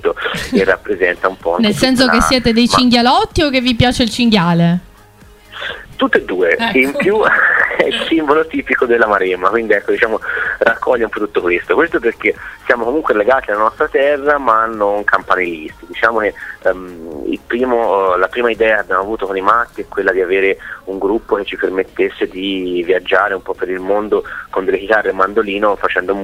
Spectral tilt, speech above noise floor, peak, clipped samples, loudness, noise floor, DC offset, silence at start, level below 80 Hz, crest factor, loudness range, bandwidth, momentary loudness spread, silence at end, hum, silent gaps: -5 dB/octave; 28 dB; 0 dBFS; under 0.1%; -14 LUFS; -42 dBFS; under 0.1%; 0 s; -38 dBFS; 14 dB; 5 LU; 16 kHz; 8 LU; 0 s; none; none